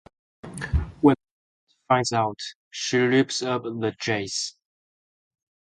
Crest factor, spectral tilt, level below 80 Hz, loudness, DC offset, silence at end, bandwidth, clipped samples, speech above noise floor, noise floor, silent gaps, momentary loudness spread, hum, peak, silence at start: 22 dB; -4.5 dB/octave; -40 dBFS; -24 LUFS; under 0.1%; 1.3 s; 11.5 kHz; under 0.1%; over 66 dB; under -90 dBFS; 1.31-1.67 s, 2.55-2.71 s; 13 LU; none; -4 dBFS; 0.45 s